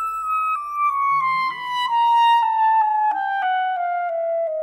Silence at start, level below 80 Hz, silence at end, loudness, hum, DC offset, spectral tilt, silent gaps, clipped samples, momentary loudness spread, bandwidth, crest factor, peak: 0 s; -66 dBFS; 0 s; -20 LUFS; none; under 0.1%; -1.5 dB/octave; none; under 0.1%; 7 LU; 14 kHz; 10 dB; -10 dBFS